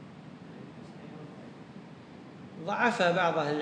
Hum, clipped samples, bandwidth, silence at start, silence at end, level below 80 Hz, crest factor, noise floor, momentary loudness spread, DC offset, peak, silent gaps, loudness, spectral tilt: none; under 0.1%; 10.5 kHz; 0 s; 0 s; -76 dBFS; 22 dB; -48 dBFS; 22 LU; under 0.1%; -12 dBFS; none; -28 LUFS; -5.5 dB/octave